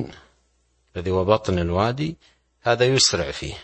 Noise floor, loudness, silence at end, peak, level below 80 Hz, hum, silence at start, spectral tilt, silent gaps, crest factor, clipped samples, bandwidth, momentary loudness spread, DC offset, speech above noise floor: -65 dBFS; -21 LUFS; 0 s; -2 dBFS; -44 dBFS; none; 0 s; -4 dB/octave; none; 22 dB; under 0.1%; 8.8 kHz; 14 LU; under 0.1%; 44 dB